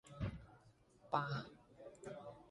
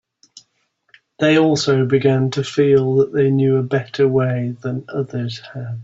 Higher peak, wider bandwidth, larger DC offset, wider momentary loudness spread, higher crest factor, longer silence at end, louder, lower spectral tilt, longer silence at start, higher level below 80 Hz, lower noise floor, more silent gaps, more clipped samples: second, -22 dBFS vs -2 dBFS; first, 11 kHz vs 8 kHz; neither; first, 19 LU vs 11 LU; first, 26 dB vs 16 dB; about the same, 0 s vs 0 s; second, -46 LUFS vs -17 LUFS; about the same, -6.5 dB/octave vs -6.5 dB/octave; second, 0.05 s vs 0.35 s; second, -62 dBFS vs -56 dBFS; about the same, -68 dBFS vs -66 dBFS; neither; neither